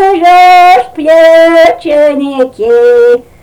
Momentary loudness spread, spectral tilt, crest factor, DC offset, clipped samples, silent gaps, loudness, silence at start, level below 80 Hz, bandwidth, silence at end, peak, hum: 7 LU; -3.5 dB/octave; 4 dB; under 0.1%; 3%; none; -5 LUFS; 0 s; -44 dBFS; 16.5 kHz; 0.2 s; 0 dBFS; none